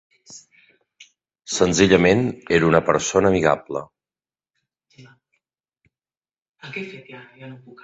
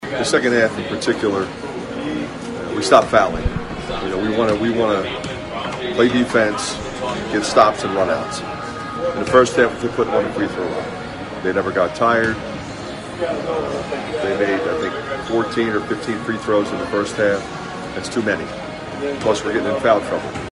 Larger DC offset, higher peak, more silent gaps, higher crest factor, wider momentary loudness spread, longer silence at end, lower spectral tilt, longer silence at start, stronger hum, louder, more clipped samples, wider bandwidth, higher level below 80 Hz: neither; about the same, -2 dBFS vs 0 dBFS; first, 6.38-6.42 s, 6.49-6.54 s vs none; about the same, 22 dB vs 20 dB; first, 25 LU vs 12 LU; first, 0.3 s vs 0 s; about the same, -4.5 dB/octave vs -4.5 dB/octave; first, 0.3 s vs 0 s; neither; about the same, -18 LUFS vs -20 LUFS; neither; second, 8.4 kHz vs 11.5 kHz; second, -48 dBFS vs -42 dBFS